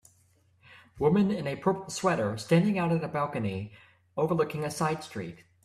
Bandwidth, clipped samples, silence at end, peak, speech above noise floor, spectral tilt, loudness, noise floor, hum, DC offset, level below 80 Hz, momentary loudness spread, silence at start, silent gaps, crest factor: 14 kHz; under 0.1%; 0.3 s; -12 dBFS; 37 dB; -6.5 dB/octave; -29 LUFS; -65 dBFS; none; under 0.1%; -62 dBFS; 14 LU; 0.7 s; none; 18 dB